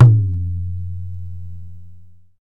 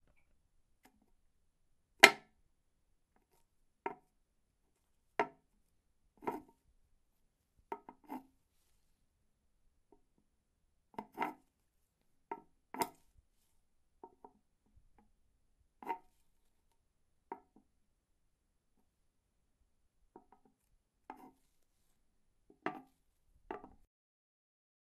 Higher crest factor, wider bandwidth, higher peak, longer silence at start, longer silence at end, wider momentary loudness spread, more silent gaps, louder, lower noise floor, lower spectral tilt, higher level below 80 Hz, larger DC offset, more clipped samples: second, 18 dB vs 44 dB; second, 1.9 kHz vs 13.5 kHz; about the same, 0 dBFS vs 0 dBFS; second, 0 s vs 2.05 s; second, 0 s vs 1.3 s; second, 21 LU vs 27 LU; neither; first, -20 LUFS vs -33 LUFS; second, -44 dBFS vs -79 dBFS; first, -11.5 dB/octave vs -1 dB/octave; first, -40 dBFS vs -76 dBFS; first, 3% vs under 0.1%; neither